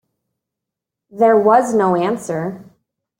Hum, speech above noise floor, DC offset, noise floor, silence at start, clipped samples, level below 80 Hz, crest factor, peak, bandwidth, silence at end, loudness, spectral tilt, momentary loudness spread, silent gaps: none; 68 dB; under 0.1%; -83 dBFS; 1.15 s; under 0.1%; -64 dBFS; 16 dB; -2 dBFS; 16 kHz; 0.55 s; -15 LUFS; -6.5 dB/octave; 12 LU; none